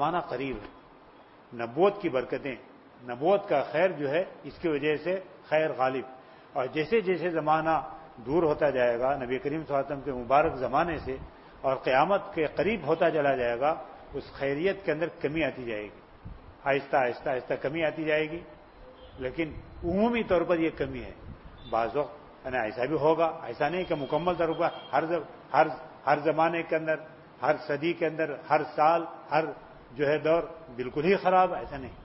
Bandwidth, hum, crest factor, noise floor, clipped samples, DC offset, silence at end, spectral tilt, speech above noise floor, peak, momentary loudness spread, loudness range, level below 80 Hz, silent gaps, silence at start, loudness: 5.8 kHz; none; 20 dB; -54 dBFS; under 0.1%; under 0.1%; 0 s; -9.5 dB/octave; 26 dB; -8 dBFS; 13 LU; 3 LU; -54 dBFS; none; 0 s; -28 LUFS